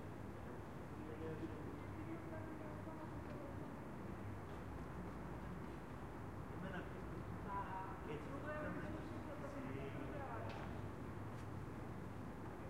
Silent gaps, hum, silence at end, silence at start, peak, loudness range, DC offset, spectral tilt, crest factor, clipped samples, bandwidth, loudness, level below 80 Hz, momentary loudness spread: none; none; 0 s; 0 s; -34 dBFS; 3 LU; 0.1%; -7.5 dB/octave; 14 dB; under 0.1%; 16 kHz; -50 LUFS; -60 dBFS; 4 LU